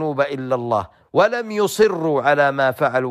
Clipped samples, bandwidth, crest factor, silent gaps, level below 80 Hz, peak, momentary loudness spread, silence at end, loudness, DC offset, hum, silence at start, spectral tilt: under 0.1%; 15.5 kHz; 14 dB; none; -58 dBFS; -4 dBFS; 6 LU; 0 s; -19 LUFS; under 0.1%; none; 0 s; -5 dB/octave